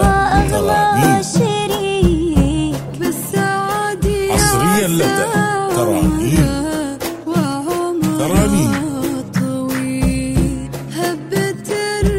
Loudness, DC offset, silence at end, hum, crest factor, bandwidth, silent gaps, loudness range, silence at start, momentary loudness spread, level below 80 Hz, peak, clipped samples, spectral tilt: -16 LUFS; under 0.1%; 0 s; none; 16 dB; 16.5 kHz; none; 3 LU; 0 s; 7 LU; -26 dBFS; 0 dBFS; under 0.1%; -5 dB/octave